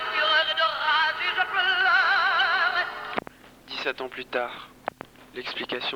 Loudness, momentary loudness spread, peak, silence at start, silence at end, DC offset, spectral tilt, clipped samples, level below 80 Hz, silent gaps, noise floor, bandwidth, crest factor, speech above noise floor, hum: -23 LUFS; 17 LU; -10 dBFS; 0 s; 0 s; under 0.1%; -2 dB/octave; under 0.1%; -64 dBFS; none; -47 dBFS; 20 kHz; 16 dB; 15 dB; none